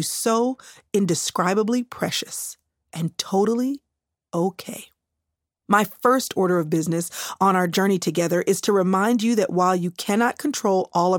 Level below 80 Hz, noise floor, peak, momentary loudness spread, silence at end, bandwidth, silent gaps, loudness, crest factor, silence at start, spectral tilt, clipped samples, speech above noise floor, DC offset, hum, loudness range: -70 dBFS; -82 dBFS; -4 dBFS; 10 LU; 0 s; 17.5 kHz; none; -22 LUFS; 18 dB; 0 s; -4.5 dB/octave; under 0.1%; 60 dB; under 0.1%; none; 6 LU